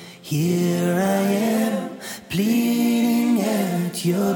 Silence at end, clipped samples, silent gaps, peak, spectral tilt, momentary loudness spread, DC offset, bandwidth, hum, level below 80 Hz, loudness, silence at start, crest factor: 0 s; under 0.1%; none; -10 dBFS; -6 dB/octave; 8 LU; under 0.1%; 17.5 kHz; none; -60 dBFS; -21 LUFS; 0 s; 12 dB